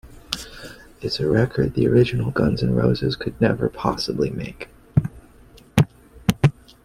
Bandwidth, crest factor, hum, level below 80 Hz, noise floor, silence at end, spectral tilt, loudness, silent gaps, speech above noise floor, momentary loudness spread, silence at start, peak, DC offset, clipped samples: 16 kHz; 22 dB; none; -42 dBFS; -48 dBFS; 0.35 s; -7 dB/octave; -22 LUFS; none; 28 dB; 14 LU; 0.05 s; 0 dBFS; under 0.1%; under 0.1%